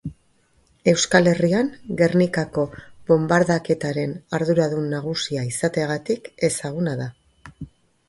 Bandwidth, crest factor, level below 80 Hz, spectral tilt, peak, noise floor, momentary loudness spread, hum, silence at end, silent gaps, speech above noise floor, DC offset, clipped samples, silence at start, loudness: 11.5 kHz; 20 dB; -54 dBFS; -5 dB/octave; 0 dBFS; -61 dBFS; 13 LU; none; 0.45 s; none; 40 dB; under 0.1%; under 0.1%; 0.05 s; -21 LUFS